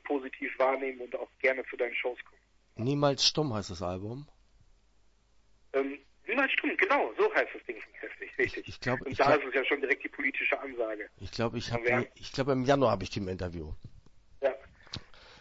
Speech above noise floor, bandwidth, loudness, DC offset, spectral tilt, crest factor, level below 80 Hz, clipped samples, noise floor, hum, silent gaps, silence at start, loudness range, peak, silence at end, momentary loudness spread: 34 dB; 8 kHz; -30 LUFS; under 0.1%; -4.5 dB/octave; 20 dB; -56 dBFS; under 0.1%; -65 dBFS; none; none; 0.05 s; 3 LU; -12 dBFS; 0 s; 16 LU